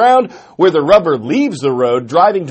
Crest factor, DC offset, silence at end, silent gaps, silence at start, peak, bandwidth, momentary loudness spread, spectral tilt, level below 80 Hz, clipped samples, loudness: 12 dB; under 0.1%; 0 s; none; 0 s; 0 dBFS; 8.8 kHz; 5 LU; -6 dB/octave; -50 dBFS; 0.2%; -12 LUFS